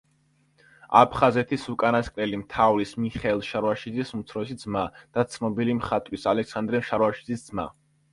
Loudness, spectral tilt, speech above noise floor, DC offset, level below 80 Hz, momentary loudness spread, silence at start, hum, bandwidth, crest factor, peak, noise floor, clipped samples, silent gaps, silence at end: -25 LUFS; -6.5 dB/octave; 40 dB; under 0.1%; -52 dBFS; 12 LU; 0.9 s; none; 11.5 kHz; 24 dB; -2 dBFS; -65 dBFS; under 0.1%; none; 0.4 s